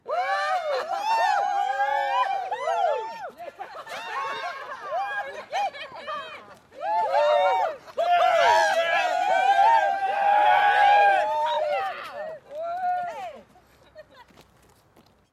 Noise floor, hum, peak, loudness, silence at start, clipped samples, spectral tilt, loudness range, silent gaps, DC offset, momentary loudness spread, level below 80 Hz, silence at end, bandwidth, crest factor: -59 dBFS; none; -10 dBFS; -23 LUFS; 0.05 s; under 0.1%; -1 dB/octave; 12 LU; none; under 0.1%; 17 LU; -70 dBFS; 1.1 s; 13.5 kHz; 16 dB